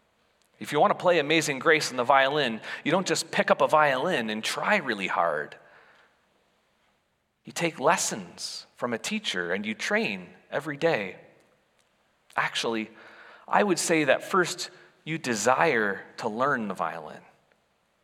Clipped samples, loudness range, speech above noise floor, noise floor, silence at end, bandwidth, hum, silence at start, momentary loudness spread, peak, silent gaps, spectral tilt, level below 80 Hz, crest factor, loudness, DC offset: under 0.1%; 7 LU; 47 dB; -73 dBFS; 0.85 s; 16.5 kHz; none; 0.6 s; 13 LU; -4 dBFS; none; -3.5 dB/octave; -80 dBFS; 22 dB; -26 LUFS; under 0.1%